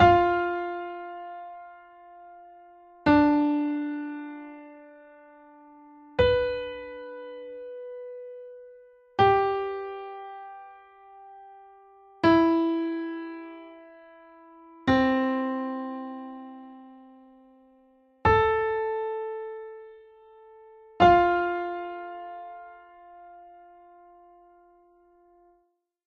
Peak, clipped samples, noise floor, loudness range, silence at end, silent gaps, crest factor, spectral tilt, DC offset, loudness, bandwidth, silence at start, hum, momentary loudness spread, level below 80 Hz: -6 dBFS; under 0.1%; -71 dBFS; 5 LU; 2.6 s; none; 22 dB; -7.5 dB/octave; under 0.1%; -25 LUFS; 7 kHz; 0 s; none; 26 LU; -52 dBFS